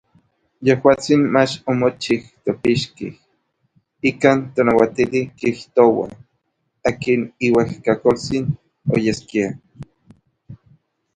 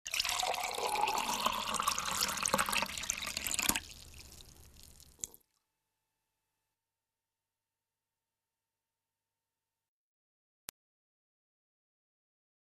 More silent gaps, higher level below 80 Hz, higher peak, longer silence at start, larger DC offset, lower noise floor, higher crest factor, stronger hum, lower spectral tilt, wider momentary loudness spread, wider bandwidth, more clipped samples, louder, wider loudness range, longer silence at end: neither; first, -52 dBFS vs -62 dBFS; first, 0 dBFS vs -8 dBFS; first, 0.6 s vs 0.05 s; neither; second, -71 dBFS vs under -90 dBFS; second, 20 dB vs 32 dB; neither; first, -6 dB/octave vs -0.5 dB/octave; second, 10 LU vs 19 LU; second, 10 kHz vs 14 kHz; neither; first, -18 LUFS vs -33 LUFS; second, 2 LU vs 20 LU; second, 0.6 s vs 7.4 s